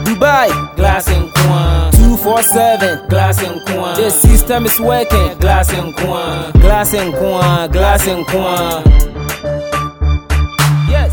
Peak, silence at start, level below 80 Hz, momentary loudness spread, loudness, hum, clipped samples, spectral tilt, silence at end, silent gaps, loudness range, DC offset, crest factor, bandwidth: 0 dBFS; 0 s; -14 dBFS; 8 LU; -12 LUFS; none; 0.5%; -5 dB/octave; 0 s; none; 3 LU; under 0.1%; 10 dB; over 20 kHz